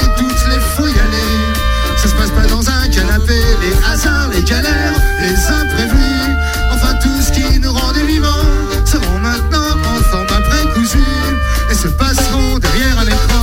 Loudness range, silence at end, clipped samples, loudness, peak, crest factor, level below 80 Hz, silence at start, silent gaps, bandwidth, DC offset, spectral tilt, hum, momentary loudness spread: 1 LU; 0 s; under 0.1%; -13 LUFS; 0 dBFS; 10 dB; -14 dBFS; 0 s; none; 16.5 kHz; under 0.1%; -4.5 dB/octave; none; 2 LU